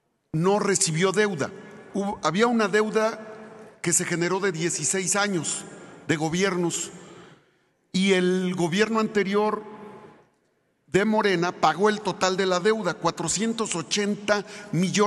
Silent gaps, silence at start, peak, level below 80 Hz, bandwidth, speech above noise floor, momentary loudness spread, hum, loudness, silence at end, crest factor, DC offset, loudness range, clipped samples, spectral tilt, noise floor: none; 0.35 s; -6 dBFS; -64 dBFS; 12.5 kHz; 45 dB; 11 LU; none; -24 LUFS; 0 s; 18 dB; under 0.1%; 2 LU; under 0.1%; -4 dB/octave; -69 dBFS